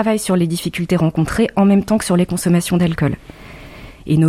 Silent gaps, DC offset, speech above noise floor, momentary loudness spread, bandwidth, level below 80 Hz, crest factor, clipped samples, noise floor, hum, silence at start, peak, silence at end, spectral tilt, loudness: none; under 0.1%; 21 dB; 21 LU; 15.5 kHz; -40 dBFS; 14 dB; under 0.1%; -36 dBFS; none; 0 s; -2 dBFS; 0 s; -6.5 dB/octave; -16 LUFS